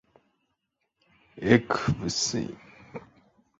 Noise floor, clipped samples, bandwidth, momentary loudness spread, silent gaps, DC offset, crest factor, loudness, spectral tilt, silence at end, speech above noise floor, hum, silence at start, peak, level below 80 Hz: -79 dBFS; under 0.1%; 8 kHz; 23 LU; none; under 0.1%; 26 dB; -26 LUFS; -4.5 dB/octave; 0.6 s; 53 dB; none; 1.35 s; -4 dBFS; -54 dBFS